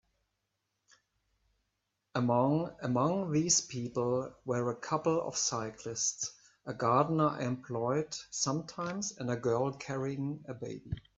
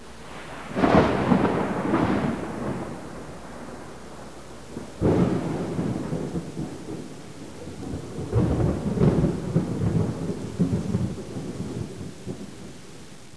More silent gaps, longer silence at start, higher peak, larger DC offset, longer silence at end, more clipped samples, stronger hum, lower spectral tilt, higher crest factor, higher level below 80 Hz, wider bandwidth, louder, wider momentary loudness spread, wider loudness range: neither; first, 2.15 s vs 0 s; second, -12 dBFS vs -6 dBFS; second, under 0.1% vs 0.6%; first, 0.2 s vs 0 s; neither; neither; second, -4.5 dB/octave vs -7.5 dB/octave; about the same, 22 dB vs 22 dB; second, -64 dBFS vs -42 dBFS; second, 8.4 kHz vs 11 kHz; second, -33 LUFS vs -26 LUFS; second, 11 LU vs 19 LU; second, 3 LU vs 6 LU